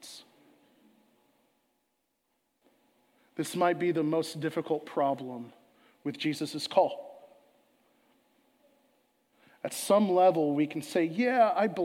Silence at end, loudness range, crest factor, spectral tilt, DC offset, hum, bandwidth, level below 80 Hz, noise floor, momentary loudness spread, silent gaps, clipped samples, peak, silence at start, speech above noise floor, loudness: 0 s; 7 LU; 22 dB; -5 dB/octave; under 0.1%; none; 16.5 kHz; -86 dBFS; -78 dBFS; 19 LU; none; under 0.1%; -10 dBFS; 0.05 s; 50 dB; -29 LUFS